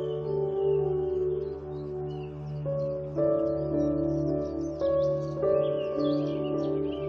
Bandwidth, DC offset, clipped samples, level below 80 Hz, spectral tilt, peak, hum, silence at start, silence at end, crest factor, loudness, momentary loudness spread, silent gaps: 6.6 kHz; under 0.1%; under 0.1%; -50 dBFS; -9 dB/octave; -14 dBFS; none; 0 s; 0 s; 14 dB; -29 LUFS; 9 LU; none